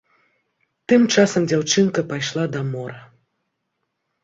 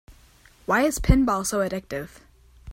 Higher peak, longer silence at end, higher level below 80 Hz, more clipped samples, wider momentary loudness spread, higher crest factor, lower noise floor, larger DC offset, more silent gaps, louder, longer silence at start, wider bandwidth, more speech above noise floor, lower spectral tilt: about the same, -2 dBFS vs -2 dBFS; first, 1.2 s vs 0 s; second, -62 dBFS vs -32 dBFS; neither; about the same, 14 LU vs 15 LU; about the same, 20 dB vs 24 dB; first, -76 dBFS vs -54 dBFS; neither; neither; first, -19 LUFS vs -23 LUFS; first, 0.9 s vs 0.1 s; second, 7.8 kHz vs 16.5 kHz; first, 57 dB vs 32 dB; about the same, -4.5 dB/octave vs -5.5 dB/octave